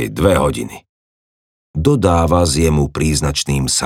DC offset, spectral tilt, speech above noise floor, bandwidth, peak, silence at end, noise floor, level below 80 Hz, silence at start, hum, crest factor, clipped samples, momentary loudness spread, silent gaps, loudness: under 0.1%; -5 dB/octave; over 75 dB; 16.5 kHz; 0 dBFS; 0 s; under -90 dBFS; -30 dBFS; 0 s; none; 16 dB; under 0.1%; 8 LU; 0.89-1.74 s; -15 LUFS